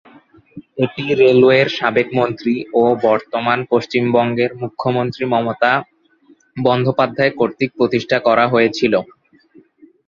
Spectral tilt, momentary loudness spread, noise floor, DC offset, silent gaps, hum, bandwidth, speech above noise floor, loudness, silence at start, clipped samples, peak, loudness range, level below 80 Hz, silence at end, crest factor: -7 dB/octave; 8 LU; -52 dBFS; under 0.1%; none; none; 7.2 kHz; 37 dB; -16 LUFS; 0.55 s; under 0.1%; 0 dBFS; 3 LU; -56 dBFS; 1.05 s; 16 dB